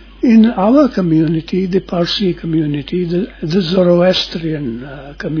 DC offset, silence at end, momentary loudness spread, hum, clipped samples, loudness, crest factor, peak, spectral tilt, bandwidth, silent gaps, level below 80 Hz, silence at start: under 0.1%; 0 s; 12 LU; none; under 0.1%; -14 LUFS; 14 dB; 0 dBFS; -7.5 dB/octave; 5.4 kHz; none; -40 dBFS; 0 s